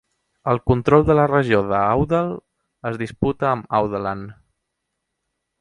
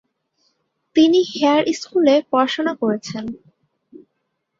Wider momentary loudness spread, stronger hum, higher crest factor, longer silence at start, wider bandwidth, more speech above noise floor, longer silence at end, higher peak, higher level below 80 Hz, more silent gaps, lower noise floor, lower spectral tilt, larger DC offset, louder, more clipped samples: about the same, 14 LU vs 14 LU; neither; about the same, 20 dB vs 16 dB; second, 0.45 s vs 0.95 s; first, 10.5 kHz vs 7.8 kHz; about the same, 59 dB vs 57 dB; about the same, 1.3 s vs 1.25 s; about the same, 0 dBFS vs -2 dBFS; first, -42 dBFS vs -64 dBFS; neither; first, -78 dBFS vs -74 dBFS; first, -8.5 dB/octave vs -4.5 dB/octave; neither; about the same, -19 LUFS vs -18 LUFS; neither